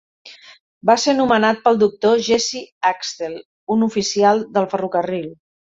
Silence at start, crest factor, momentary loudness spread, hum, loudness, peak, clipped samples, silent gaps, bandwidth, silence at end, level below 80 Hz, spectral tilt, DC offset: 0.25 s; 16 dB; 11 LU; none; -18 LUFS; -2 dBFS; under 0.1%; 0.61-0.81 s, 2.72-2.81 s, 3.45-3.67 s; 7.8 kHz; 0.35 s; -60 dBFS; -4 dB/octave; under 0.1%